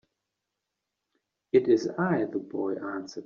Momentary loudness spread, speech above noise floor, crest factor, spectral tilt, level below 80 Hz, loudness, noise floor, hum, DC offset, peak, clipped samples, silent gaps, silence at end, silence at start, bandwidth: 10 LU; 58 dB; 20 dB; -6.5 dB/octave; -72 dBFS; -28 LUFS; -85 dBFS; none; under 0.1%; -10 dBFS; under 0.1%; none; 0 s; 1.55 s; 7.2 kHz